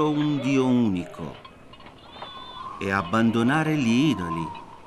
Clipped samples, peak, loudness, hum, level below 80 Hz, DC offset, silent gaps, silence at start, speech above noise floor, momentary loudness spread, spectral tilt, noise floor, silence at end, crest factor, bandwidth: under 0.1%; -8 dBFS; -23 LUFS; none; -58 dBFS; under 0.1%; none; 0 s; 23 dB; 17 LU; -6.5 dB/octave; -46 dBFS; 0 s; 16 dB; 12 kHz